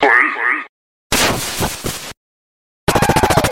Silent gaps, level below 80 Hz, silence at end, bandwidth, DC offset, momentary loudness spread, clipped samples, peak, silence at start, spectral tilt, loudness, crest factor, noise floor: 0.69-1.10 s, 2.17-2.87 s; -34 dBFS; 0 s; 16.5 kHz; under 0.1%; 14 LU; under 0.1%; 0 dBFS; 0 s; -3.5 dB/octave; -16 LUFS; 16 dB; under -90 dBFS